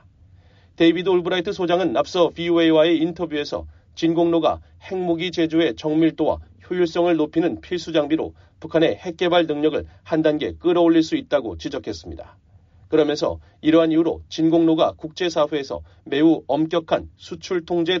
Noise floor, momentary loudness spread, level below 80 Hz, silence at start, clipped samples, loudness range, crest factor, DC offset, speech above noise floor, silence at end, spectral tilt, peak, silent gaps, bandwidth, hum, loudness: -51 dBFS; 12 LU; -50 dBFS; 0.8 s; under 0.1%; 2 LU; 16 dB; under 0.1%; 31 dB; 0 s; -4.5 dB/octave; -4 dBFS; none; 7.4 kHz; none; -21 LUFS